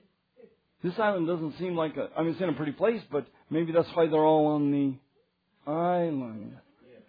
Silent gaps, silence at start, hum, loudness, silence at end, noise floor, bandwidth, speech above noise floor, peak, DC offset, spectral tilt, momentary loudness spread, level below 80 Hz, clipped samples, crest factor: none; 0.85 s; none; -28 LUFS; 0.5 s; -71 dBFS; 5 kHz; 44 dB; -12 dBFS; under 0.1%; -10 dB/octave; 12 LU; -72 dBFS; under 0.1%; 18 dB